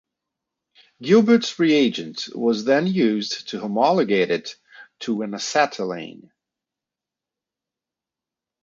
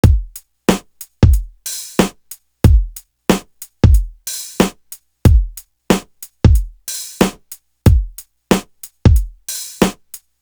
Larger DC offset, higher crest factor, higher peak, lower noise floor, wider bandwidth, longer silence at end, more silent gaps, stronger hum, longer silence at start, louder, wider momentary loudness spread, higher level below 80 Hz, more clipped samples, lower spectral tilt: neither; about the same, 18 dB vs 16 dB; second, -4 dBFS vs 0 dBFS; first, -88 dBFS vs -41 dBFS; second, 7.6 kHz vs over 20 kHz; first, 2.5 s vs 0.25 s; neither; neither; first, 1 s vs 0.05 s; second, -20 LUFS vs -17 LUFS; second, 13 LU vs 22 LU; second, -70 dBFS vs -20 dBFS; neither; about the same, -5 dB/octave vs -6 dB/octave